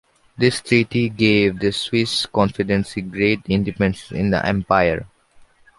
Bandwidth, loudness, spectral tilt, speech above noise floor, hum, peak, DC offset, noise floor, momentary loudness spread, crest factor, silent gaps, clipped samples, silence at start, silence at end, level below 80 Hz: 11.5 kHz; -19 LUFS; -5.5 dB/octave; 32 dB; none; -2 dBFS; under 0.1%; -51 dBFS; 5 LU; 18 dB; none; under 0.1%; 0.4 s; 0.7 s; -44 dBFS